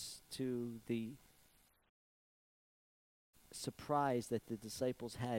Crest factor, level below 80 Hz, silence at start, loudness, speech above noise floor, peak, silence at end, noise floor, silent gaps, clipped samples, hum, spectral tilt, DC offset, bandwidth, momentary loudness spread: 20 dB; -74 dBFS; 0 s; -42 LUFS; 31 dB; -24 dBFS; 0 s; -72 dBFS; 1.89-3.33 s; under 0.1%; none; -5.5 dB/octave; under 0.1%; 16 kHz; 11 LU